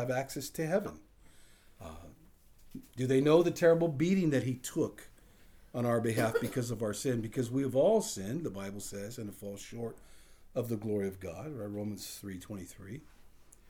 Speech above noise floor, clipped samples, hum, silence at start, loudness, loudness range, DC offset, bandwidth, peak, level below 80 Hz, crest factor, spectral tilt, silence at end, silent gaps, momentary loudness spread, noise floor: 26 dB; under 0.1%; none; 0 s; -33 LUFS; 9 LU; under 0.1%; over 20 kHz; -12 dBFS; -60 dBFS; 20 dB; -6 dB/octave; 0.25 s; none; 19 LU; -58 dBFS